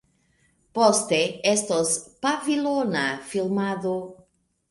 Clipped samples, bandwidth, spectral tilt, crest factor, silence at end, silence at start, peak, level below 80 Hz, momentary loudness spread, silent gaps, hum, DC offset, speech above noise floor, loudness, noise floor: under 0.1%; 11.5 kHz; -3.5 dB/octave; 20 dB; 0.55 s; 0.75 s; -4 dBFS; -66 dBFS; 9 LU; none; none; under 0.1%; 41 dB; -24 LUFS; -65 dBFS